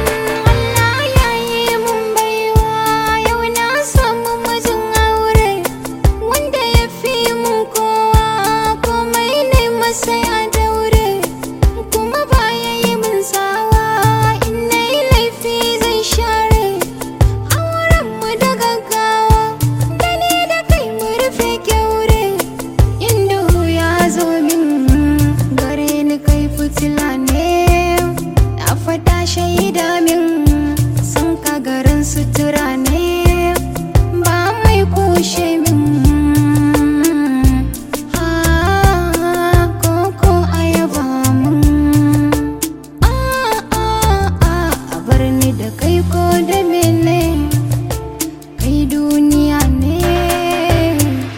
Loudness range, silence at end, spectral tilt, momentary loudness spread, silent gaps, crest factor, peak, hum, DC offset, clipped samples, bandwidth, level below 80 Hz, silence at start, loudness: 2 LU; 0 s; -5 dB/octave; 5 LU; none; 14 dB; 0 dBFS; none; under 0.1%; under 0.1%; 17 kHz; -20 dBFS; 0 s; -14 LUFS